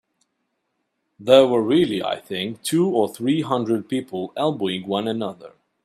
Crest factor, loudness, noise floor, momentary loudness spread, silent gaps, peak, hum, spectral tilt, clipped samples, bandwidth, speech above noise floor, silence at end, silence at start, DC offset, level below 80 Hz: 22 dB; -21 LUFS; -74 dBFS; 12 LU; none; 0 dBFS; none; -5.5 dB/octave; under 0.1%; 15 kHz; 54 dB; 0.35 s; 1.2 s; under 0.1%; -66 dBFS